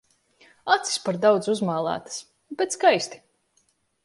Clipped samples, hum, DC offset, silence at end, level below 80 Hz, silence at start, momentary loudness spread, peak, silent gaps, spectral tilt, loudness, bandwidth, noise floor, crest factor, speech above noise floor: under 0.1%; none; under 0.1%; 0.9 s; -72 dBFS; 0.65 s; 16 LU; -4 dBFS; none; -3.5 dB/octave; -23 LUFS; 11.5 kHz; -68 dBFS; 22 dB; 45 dB